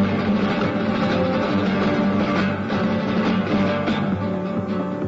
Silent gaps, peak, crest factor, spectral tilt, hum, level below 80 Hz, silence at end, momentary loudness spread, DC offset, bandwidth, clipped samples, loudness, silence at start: none; -8 dBFS; 12 dB; -7.5 dB/octave; none; -48 dBFS; 0 s; 4 LU; under 0.1%; 7.6 kHz; under 0.1%; -21 LUFS; 0 s